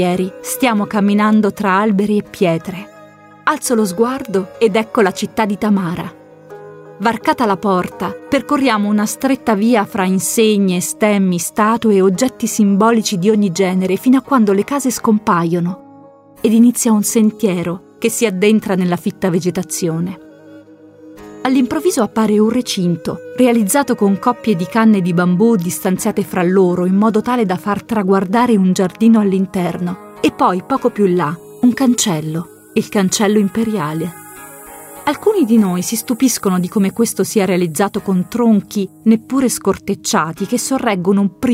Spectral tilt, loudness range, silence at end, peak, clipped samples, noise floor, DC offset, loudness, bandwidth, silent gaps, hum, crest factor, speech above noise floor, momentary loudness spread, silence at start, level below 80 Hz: -5.5 dB/octave; 4 LU; 0 s; 0 dBFS; under 0.1%; -41 dBFS; under 0.1%; -15 LUFS; 16 kHz; none; none; 14 dB; 27 dB; 8 LU; 0 s; -54 dBFS